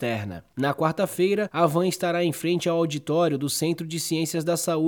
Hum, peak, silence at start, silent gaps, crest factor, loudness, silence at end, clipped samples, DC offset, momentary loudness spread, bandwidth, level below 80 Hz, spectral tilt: none; -8 dBFS; 0 s; none; 16 dB; -25 LUFS; 0 s; under 0.1%; under 0.1%; 5 LU; 19 kHz; -66 dBFS; -5 dB/octave